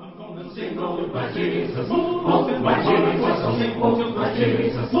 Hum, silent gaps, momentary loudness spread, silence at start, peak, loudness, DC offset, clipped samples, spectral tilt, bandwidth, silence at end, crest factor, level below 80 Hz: none; none; 10 LU; 0 s; -6 dBFS; -22 LUFS; under 0.1%; under 0.1%; -11.5 dB/octave; 5.8 kHz; 0 s; 16 dB; -52 dBFS